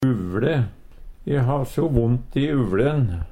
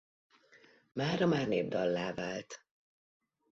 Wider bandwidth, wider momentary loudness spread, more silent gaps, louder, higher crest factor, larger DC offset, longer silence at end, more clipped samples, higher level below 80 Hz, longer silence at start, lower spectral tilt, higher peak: first, 13.5 kHz vs 7.8 kHz; second, 5 LU vs 15 LU; neither; first, -22 LUFS vs -34 LUFS; about the same, 18 dB vs 18 dB; neither; second, 0 s vs 0.95 s; neither; first, -36 dBFS vs -70 dBFS; second, 0 s vs 0.95 s; first, -8.5 dB/octave vs -5 dB/octave; first, -4 dBFS vs -18 dBFS